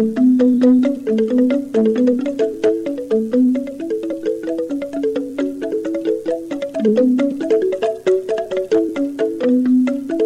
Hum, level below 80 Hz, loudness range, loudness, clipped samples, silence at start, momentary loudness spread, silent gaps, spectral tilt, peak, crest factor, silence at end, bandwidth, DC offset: none; -58 dBFS; 4 LU; -18 LUFS; under 0.1%; 0 s; 9 LU; none; -7 dB/octave; -4 dBFS; 14 dB; 0 s; 9.6 kHz; 0.1%